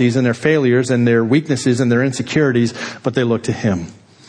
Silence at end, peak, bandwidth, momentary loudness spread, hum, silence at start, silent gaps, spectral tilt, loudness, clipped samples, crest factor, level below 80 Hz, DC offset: 0.35 s; -2 dBFS; 10 kHz; 6 LU; none; 0 s; none; -6.5 dB/octave; -16 LUFS; under 0.1%; 14 dB; -52 dBFS; under 0.1%